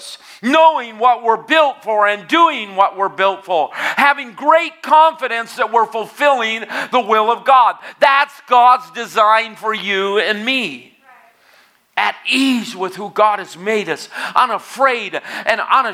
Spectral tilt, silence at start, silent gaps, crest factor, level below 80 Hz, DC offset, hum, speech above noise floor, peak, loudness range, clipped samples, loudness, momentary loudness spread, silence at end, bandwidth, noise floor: -3 dB/octave; 0 s; none; 16 dB; -74 dBFS; under 0.1%; none; 37 dB; 0 dBFS; 5 LU; under 0.1%; -15 LUFS; 10 LU; 0 s; 15.5 kHz; -52 dBFS